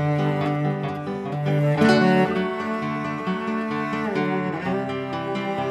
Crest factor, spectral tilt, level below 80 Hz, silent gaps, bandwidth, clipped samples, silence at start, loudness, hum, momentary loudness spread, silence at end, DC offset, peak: 18 dB; -7.5 dB/octave; -60 dBFS; none; 11 kHz; under 0.1%; 0 s; -23 LUFS; none; 10 LU; 0 s; under 0.1%; -6 dBFS